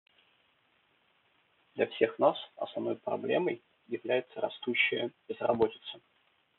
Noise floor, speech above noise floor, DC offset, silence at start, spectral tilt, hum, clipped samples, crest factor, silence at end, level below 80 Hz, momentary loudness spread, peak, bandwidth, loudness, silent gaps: -71 dBFS; 39 dB; under 0.1%; 1.75 s; -2.5 dB/octave; none; under 0.1%; 22 dB; 0.6 s; -76 dBFS; 14 LU; -12 dBFS; 4.3 kHz; -32 LUFS; none